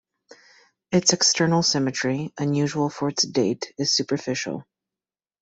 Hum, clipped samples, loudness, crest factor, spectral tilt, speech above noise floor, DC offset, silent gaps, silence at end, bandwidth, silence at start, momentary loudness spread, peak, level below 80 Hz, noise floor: none; under 0.1%; -22 LUFS; 20 dB; -3.5 dB/octave; over 67 dB; under 0.1%; none; 0.8 s; 8.4 kHz; 0.9 s; 9 LU; -4 dBFS; -62 dBFS; under -90 dBFS